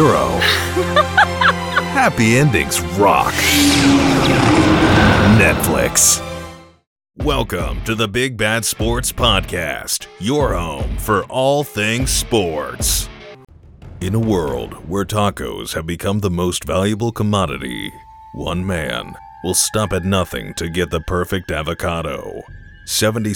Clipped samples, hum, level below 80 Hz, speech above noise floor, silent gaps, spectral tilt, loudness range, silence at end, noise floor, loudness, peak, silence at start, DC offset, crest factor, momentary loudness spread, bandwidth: under 0.1%; none; -32 dBFS; 21 dB; 6.87-6.96 s; -4 dB/octave; 8 LU; 0 s; -38 dBFS; -16 LUFS; 0 dBFS; 0 s; under 0.1%; 16 dB; 13 LU; 20 kHz